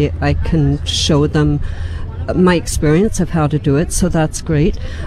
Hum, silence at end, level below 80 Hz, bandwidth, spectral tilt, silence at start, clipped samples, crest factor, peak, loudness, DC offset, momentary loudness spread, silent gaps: none; 0 s; -24 dBFS; 13.5 kHz; -5.5 dB/octave; 0 s; under 0.1%; 12 dB; -2 dBFS; -15 LUFS; under 0.1%; 7 LU; none